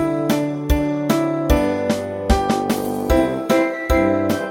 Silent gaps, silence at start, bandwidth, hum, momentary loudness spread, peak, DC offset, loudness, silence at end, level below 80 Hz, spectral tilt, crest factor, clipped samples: none; 0 s; 16.5 kHz; none; 3 LU; -2 dBFS; under 0.1%; -19 LUFS; 0 s; -26 dBFS; -6 dB/octave; 16 dB; under 0.1%